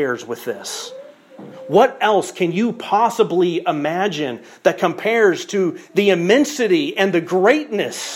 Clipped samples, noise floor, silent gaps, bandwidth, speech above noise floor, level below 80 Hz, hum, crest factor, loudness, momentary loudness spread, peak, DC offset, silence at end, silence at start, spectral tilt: under 0.1%; -39 dBFS; none; 16.5 kHz; 22 dB; -72 dBFS; none; 16 dB; -18 LUFS; 11 LU; -2 dBFS; under 0.1%; 0 s; 0 s; -4.5 dB/octave